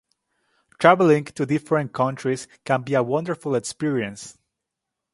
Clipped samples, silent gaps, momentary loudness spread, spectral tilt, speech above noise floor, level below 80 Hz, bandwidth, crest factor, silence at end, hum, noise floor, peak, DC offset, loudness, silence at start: under 0.1%; none; 11 LU; -6 dB/octave; 62 dB; -64 dBFS; 11.5 kHz; 22 dB; 0.8 s; none; -83 dBFS; 0 dBFS; under 0.1%; -22 LUFS; 0.8 s